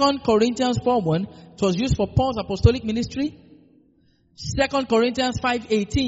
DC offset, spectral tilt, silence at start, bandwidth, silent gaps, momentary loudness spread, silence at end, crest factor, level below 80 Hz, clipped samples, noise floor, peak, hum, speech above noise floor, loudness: under 0.1%; -5 dB/octave; 0 s; 8 kHz; none; 8 LU; 0 s; 20 dB; -38 dBFS; under 0.1%; -60 dBFS; -2 dBFS; none; 39 dB; -22 LUFS